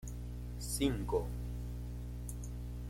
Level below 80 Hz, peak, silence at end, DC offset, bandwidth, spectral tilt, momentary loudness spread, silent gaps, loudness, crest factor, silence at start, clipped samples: -44 dBFS; -20 dBFS; 0 s; under 0.1%; 16.5 kHz; -5.5 dB/octave; 10 LU; none; -40 LUFS; 18 dB; 0 s; under 0.1%